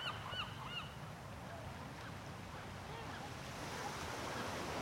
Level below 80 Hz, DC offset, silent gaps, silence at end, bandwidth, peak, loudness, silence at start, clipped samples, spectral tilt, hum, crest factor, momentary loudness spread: -62 dBFS; under 0.1%; none; 0 s; 16 kHz; -30 dBFS; -46 LUFS; 0 s; under 0.1%; -4 dB/octave; none; 16 dB; 7 LU